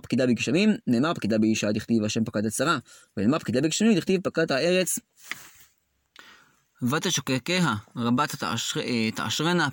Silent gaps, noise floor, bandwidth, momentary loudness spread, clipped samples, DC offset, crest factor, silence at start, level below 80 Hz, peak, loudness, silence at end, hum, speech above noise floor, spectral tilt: none; -68 dBFS; 17 kHz; 6 LU; under 0.1%; under 0.1%; 14 dB; 0.05 s; -64 dBFS; -10 dBFS; -25 LUFS; 0 s; none; 43 dB; -4.5 dB/octave